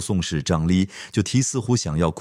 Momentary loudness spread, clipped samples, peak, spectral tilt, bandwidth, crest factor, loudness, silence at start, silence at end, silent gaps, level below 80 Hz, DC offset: 4 LU; under 0.1%; -6 dBFS; -5 dB/octave; 13 kHz; 16 dB; -22 LUFS; 0 s; 0 s; none; -42 dBFS; under 0.1%